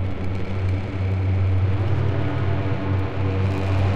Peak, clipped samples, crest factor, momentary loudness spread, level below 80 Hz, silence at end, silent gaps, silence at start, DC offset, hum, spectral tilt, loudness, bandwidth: -10 dBFS; under 0.1%; 10 dB; 4 LU; -38 dBFS; 0 s; none; 0 s; 3%; none; -8.5 dB/octave; -23 LUFS; 5.6 kHz